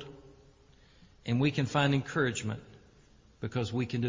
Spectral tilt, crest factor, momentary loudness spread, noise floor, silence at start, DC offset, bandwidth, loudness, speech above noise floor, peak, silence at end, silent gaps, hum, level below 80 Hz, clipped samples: -6 dB/octave; 18 dB; 15 LU; -60 dBFS; 0 s; under 0.1%; 7.6 kHz; -31 LUFS; 30 dB; -14 dBFS; 0 s; none; none; -60 dBFS; under 0.1%